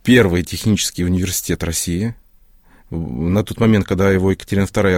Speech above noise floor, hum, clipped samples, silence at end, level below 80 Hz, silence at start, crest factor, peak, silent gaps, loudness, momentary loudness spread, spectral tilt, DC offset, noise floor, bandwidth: 33 dB; none; under 0.1%; 0 s; -38 dBFS; 0.05 s; 16 dB; 0 dBFS; none; -17 LUFS; 8 LU; -5 dB/octave; under 0.1%; -49 dBFS; 16.5 kHz